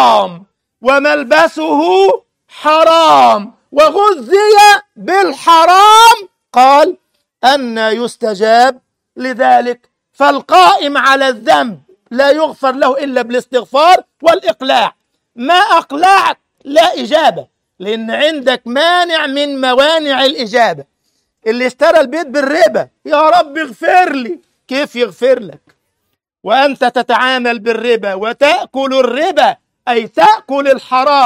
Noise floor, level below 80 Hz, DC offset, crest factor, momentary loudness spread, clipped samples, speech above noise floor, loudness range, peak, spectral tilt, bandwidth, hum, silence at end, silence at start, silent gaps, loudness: -69 dBFS; -56 dBFS; under 0.1%; 10 dB; 11 LU; 0.2%; 59 dB; 6 LU; 0 dBFS; -2.5 dB/octave; 16.5 kHz; none; 0 s; 0 s; none; -10 LUFS